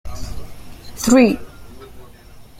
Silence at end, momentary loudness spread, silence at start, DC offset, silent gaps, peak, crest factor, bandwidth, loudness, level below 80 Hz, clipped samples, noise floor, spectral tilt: 0 s; 26 LU; 0.05 s; under 0.1%; none; -2 dBFS; 18 dB; 16 kHz; -15 LUFS; -38 dBFS; under 0.1%; -41 dBFS; -4.5 dB/octave